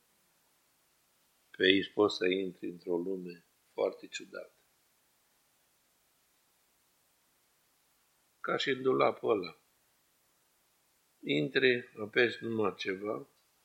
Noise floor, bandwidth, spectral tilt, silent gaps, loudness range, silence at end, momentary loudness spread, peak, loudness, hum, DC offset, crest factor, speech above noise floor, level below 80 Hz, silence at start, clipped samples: -72 dBFS; 16 kHz; -5 dB/octave; none; 11 LU; 0.4 s; 17 LU; -8 dBFS; -32 LUFS; none; under 0.1%; 28 dB; 40 dB; -84 dBFS; 1.6 s; under 0.1%